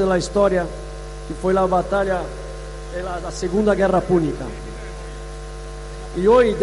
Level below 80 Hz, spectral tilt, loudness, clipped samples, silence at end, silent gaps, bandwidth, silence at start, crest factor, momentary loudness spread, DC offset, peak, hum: -34 dBFS; -6 dB/octave; -20 LUFS; under 0.1%; 0 s; none; 11.5 kHz; 0 s; 14 dB; 17 LU; under 0.1%; -6 dBFS; 50 Hz at -35 dBFS